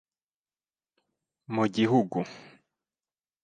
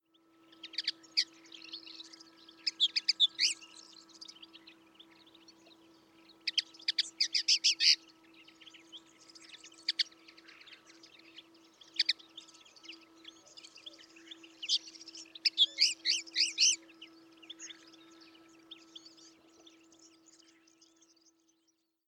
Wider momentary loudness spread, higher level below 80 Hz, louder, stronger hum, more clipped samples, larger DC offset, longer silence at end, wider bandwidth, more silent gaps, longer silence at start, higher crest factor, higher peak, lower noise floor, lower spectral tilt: second, 10 LU vs 27 LU; first, -72 dBFS vs under -90 dBFS; first, -27 LUFS vs -30 LUFS; neither; neither; neither; second, 1.05 s vs 3.1 s; second, 9.2 kHz vs 18.5 kHz; neither; first, 1.5 s vs 0.65 s; about the same, 22 dB vs 24 dB; first, -10 dBFS vs -14 dBFS; first, under -90 dBFS vs -78 dBFS; first, -7 dB/octave vs 3.5 dB/octave